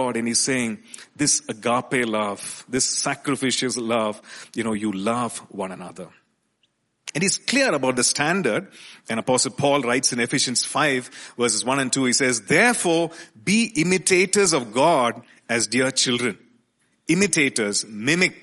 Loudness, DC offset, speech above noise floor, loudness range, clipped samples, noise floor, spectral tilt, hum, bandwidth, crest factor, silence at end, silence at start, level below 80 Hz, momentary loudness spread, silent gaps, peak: -21 LUFS; under 0.1%; 47 dB; 6 LU; under 0.1%; -69 dBFS; -3 dB/octave; none; 11.5 kHz; 20 dB; 0.05 s; 0 s; -62 dBFS; 14 LU; none; -4 dBFS